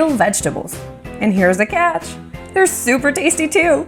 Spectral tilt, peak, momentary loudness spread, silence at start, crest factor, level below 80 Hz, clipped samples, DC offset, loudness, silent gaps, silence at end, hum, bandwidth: -4 dB/octave; 0 dBFS; 15 LU; 0 s; 16 dB; -42 dBFS; under 0.1%; under 0.1%; -16 LUFS; none; 0 s; none; 19.5 kHz